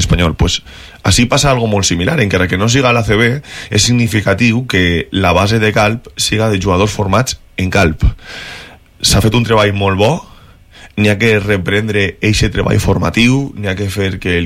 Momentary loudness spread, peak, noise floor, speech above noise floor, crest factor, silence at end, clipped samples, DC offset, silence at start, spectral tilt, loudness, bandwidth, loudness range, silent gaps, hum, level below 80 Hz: 7 LU; 0 dBFS; -39 dBFS; 27 dB; 12 dB; 0 s; under 0.1%; under 0.1%; 0 s; -4.5 dB/octave; -12 LUFS; 15.5 kHz; 2 LU; none; none; -26 dBFS